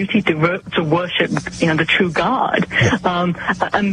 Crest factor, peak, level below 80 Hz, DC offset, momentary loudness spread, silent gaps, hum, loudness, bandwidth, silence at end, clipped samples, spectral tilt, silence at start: 14 dB; -4 dBFS; -44 dBFS; under 0.1%; 4 LU; none; none; -17 LUFS; 10.5 kHz; 0 s; under 0.1%; -5.5 dB/octave; 0 s